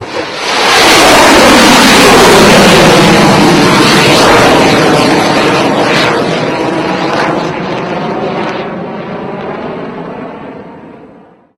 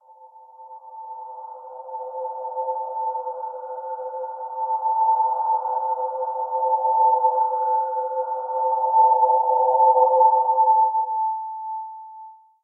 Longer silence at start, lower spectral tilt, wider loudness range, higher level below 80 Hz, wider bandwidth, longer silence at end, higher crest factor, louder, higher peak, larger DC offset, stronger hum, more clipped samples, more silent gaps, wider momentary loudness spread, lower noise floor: second, 0 s vs 0.2 s; second, -3.5 dB/octave vs -5 dB/octave; first, 15 LU vs 12 LU; first, -32 dBFS vs under -90 dBFS; first, over 20 kHz vs 1.6 kHz; first, 0.5 s vs 0.3 s; second, 8 dB vs 16 dB; first, -5 LUFS vs -21 LUFS; first, 0 dBFS vs -6 dBFS; neither; neither; first, 3% vs under 0.1%; neither; second, 17 LU vs 20 LU; second, -38 dBFS vs -48 dBFS